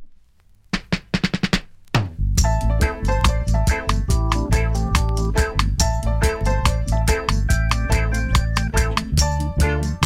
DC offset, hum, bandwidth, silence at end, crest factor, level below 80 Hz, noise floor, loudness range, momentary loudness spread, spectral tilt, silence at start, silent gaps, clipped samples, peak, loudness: under 0.1%; none; 16 kHz; 0 s; 16 dB; -22 dBFS; -52 dBFS; 1 LU; 3 LU; -5 dB/octave; 0 s; none; under 0.1%; -2 dBFS; -21 LUFS